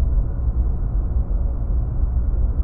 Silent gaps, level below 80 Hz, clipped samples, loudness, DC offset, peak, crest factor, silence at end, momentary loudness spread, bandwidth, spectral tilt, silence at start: none; -20 dBFS; under 0.1%; -24 LUFS; under 0.1%; -8 dBFS; 10 dB; 0 s; 2 LU; 1.6 kHz; -13.5 dB/octave; 0 s